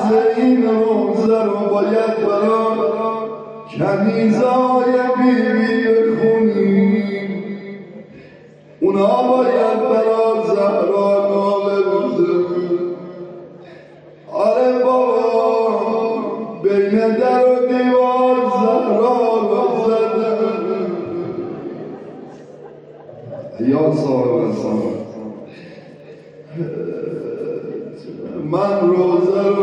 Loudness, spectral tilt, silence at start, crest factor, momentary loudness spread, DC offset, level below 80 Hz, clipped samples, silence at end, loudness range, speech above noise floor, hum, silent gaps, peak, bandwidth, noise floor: -16 LUFS; -8 dB/octave; 0 s; 14 dB; 16 LU; under 0.1%; -64 dBFS; under 0.1%; 0 s; 8 LU; 28 dB; none; none; -4 dBFS; 8.8 kHz; -43 dBFS